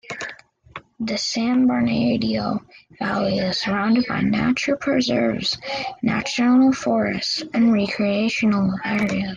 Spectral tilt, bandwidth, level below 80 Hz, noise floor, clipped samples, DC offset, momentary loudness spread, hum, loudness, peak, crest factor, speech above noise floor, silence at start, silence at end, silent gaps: -5 dB/octave; 9.2 kHz; -52 dBFS; -42 dBFS; under 0.1%; under 0.1%; 10 LU; none; -21 LUFS; -8 dBFS; 14 dB; 22 dB; 0.1 s; 0 s; none